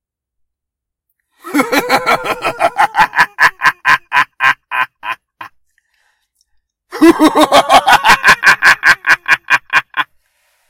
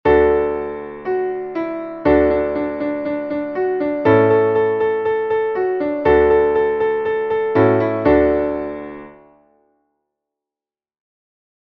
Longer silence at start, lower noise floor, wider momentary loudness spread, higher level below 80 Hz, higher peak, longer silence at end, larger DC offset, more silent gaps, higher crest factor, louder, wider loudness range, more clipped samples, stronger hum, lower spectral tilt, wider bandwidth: first, 1.45 s vs 0.05 s; second, -80 dBFS vs under -90 dBFS; about the same, 12 LU vs 11 LU; second, -46 dBFS vs -40 dBFS; about the same, 0 dBFS vs -2 dBFS; second, 0.65 s vs 2.5 s; neither; neither; about the same, 12 dB vs 16 dB; first, -10 LUFS vs -17 LUFS; about the same, 7 LU vs 5 LU; first, 0.8% vs under 0.1%; neither; second, -2.5 dB/octave vs -9.5 dB/octave; first, 20 kHz vs 4.9 kHz